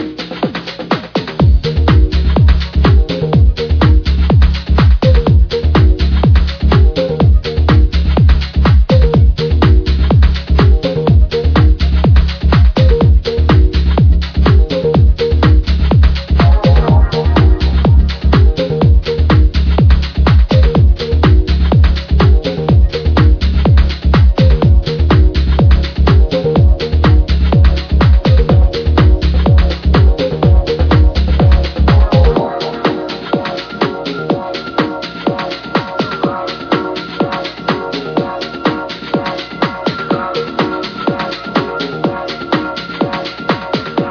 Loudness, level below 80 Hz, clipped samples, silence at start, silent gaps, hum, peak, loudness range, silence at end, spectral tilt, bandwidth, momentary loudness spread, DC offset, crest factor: -12 LUFS; -12 dBFS; under 0.1%; 0 s; none; none; 0 dBFS; 7 LU; 0 s; -8.5 dB/octave; 5.4 kHz; 8 LU; under 0.1%; 10 dB